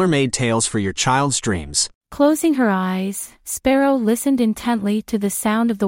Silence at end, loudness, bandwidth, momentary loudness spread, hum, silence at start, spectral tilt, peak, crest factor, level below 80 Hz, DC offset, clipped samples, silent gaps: 0 s; -19 LUFS; 16.5 kHz; 6 LU; none; 0 s; -4.5 dB/octave; -4 dBFS; 14 dB; -46 dBFS; under 0.1%; under 0.1%; 1.95-2.01 s